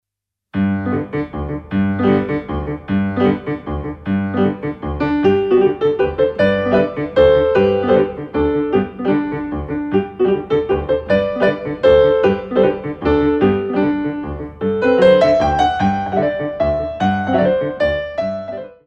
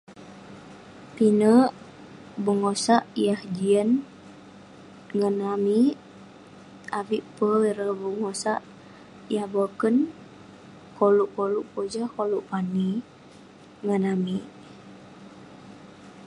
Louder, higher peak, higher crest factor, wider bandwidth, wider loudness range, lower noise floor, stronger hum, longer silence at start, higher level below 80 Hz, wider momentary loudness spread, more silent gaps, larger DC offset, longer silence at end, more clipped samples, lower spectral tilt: first, -17 LUFS vs -25 LUFS; first, 0 dBFS vs -6 dBFS; about the same, 16 dB vs 20 dB; second, 7.4 kHz vs 11.5 kHz; about the same, 4 LU vs 6 LU; first, -82 dBFS vs -49 dBFS; neither; first, 0.55 s vs 0.1 s; first, -36 dBFS vs -68 dBFS; second, 11 LU vs 25 LU; neither; neither; first, 0.15 s vs 0 s; neither; first, -8 dB/octave vs -6 dB/octave